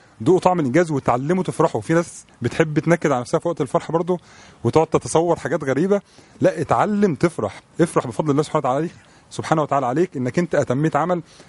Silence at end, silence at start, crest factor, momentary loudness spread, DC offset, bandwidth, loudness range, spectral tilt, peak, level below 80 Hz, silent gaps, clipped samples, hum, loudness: 0.05 s; 0.2 s; 20 dB; 6 LU; under 0.1%; 11.5 kHz; 1 LU; -6.5 dB/octave; 0 dBFS; -54 dBFS; none; under 0.1%; none; -20 LUFS